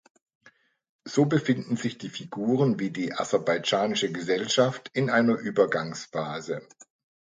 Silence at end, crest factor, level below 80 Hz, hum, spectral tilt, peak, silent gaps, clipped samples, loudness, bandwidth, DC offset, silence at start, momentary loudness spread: 0.4 s; 20 dB; -72 dBFS; none; -5 dB/octave; -8 dBFS; none; under 0.1%; -26 LUFS; 9.4 kHz; under 0.1%; 1.05 s; 10 LU